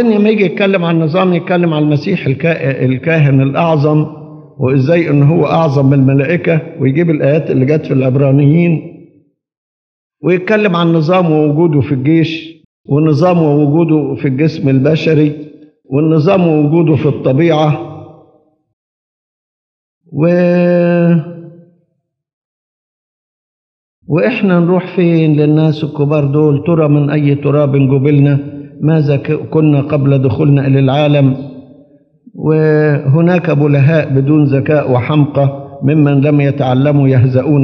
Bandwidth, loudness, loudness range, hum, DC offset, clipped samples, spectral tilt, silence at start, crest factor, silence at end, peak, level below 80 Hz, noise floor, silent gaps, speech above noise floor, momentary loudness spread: 6 kHz; -11 LUFS; 4 LU; none; under 0.1%; under 0.1%; -9.5 dB/octave; 0 s; 12 dB; 0 s; 0 dBFS; -56 dBFS; -67 dBFS; 9.57-10.10 s, 12.65-12.84 s, 18.73-20.01 s, 22.33-24.02 s; 57 dB; 5 LU